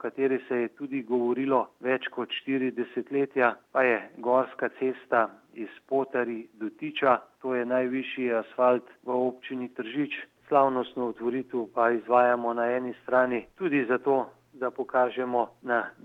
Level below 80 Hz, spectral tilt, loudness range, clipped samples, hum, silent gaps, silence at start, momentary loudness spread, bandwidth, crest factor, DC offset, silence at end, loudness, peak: -76 dBFS; -7.5 dB/octave; 3 LU; under 0.1%; none; none; 0 s; 9 LU; 4.8 kHz; 20 dB; under 0.1%; 0.15 s; -28 LUFS; -8 dBFS